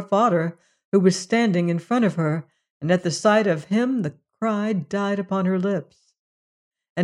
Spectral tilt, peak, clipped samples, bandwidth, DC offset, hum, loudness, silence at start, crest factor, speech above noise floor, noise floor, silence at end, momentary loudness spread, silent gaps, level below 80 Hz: -6 dB/octave; -6 dBFS; under 0.1%; 11.5 kHz; under 0.1%; none; -22 LUFS; 0 s; 16 dB; over 69 dB; under -90 dBFS; 0 s; 9 LU; 0.85-0.92 s, 2.70-2.80 s, 6.19-6.71 s, 6.90-6.96 s; -70 dBFS